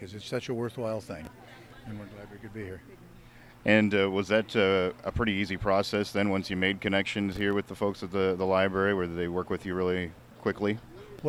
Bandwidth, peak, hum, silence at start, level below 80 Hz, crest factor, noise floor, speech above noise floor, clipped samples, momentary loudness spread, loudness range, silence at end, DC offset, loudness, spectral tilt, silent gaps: 15.5 kHz; -6 dBFS; none; 0 s; -54 dBFS; 22 dB; -52 dBFS; 23 dB; under 0.1%; 18 LU; 6 LU; 0 s; under 0.1%; -29 LUFS; -6 dB/octave; none